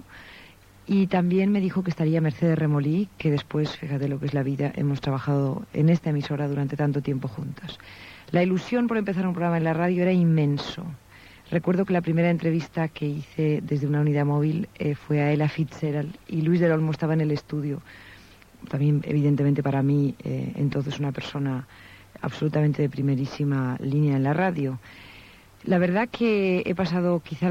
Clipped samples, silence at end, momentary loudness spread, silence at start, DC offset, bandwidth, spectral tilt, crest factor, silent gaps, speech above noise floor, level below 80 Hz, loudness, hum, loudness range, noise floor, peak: under 0.1%; 0 s; 11 LU; 0.1 s; under 0.1%; 7.4 kHz; -8.5 dB/octave; 16 dB; none; 26 dB; -58 dBFS; -25 LUFS; none; 2 LU; -50 dBFS; -10 dBFS